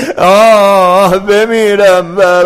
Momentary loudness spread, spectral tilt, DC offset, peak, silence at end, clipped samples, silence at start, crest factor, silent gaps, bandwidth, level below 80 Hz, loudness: 5 LU; -4.5 dB/octave; under 0.1%; 0 dBFS; 0 s; 1%; 0 s; 6 dB; none; 16 kHz; -40 dBFS; -7 LUFS